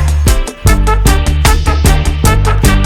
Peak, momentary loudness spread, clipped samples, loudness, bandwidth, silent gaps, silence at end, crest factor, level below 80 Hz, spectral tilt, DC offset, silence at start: 0 dBFS; 2 LU; under 0.1%; -11 LUFS; 17.5 kHz; none; 0 s; 8 dB; -10 dBFS; -5 dB/octave; under 0.1%; 0 s